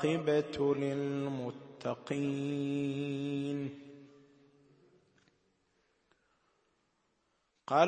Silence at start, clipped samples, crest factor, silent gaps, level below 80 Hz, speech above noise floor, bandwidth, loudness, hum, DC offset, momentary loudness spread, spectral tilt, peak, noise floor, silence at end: 0 s; under 0.1%; 26 dB; none; -74 dBFS; 44 dB; 8.4 kHz; -35 LUFS; none; under 0.1%; 12 LU; -7 dB/octave; -12 dBFS; -78 dBFS; 0 s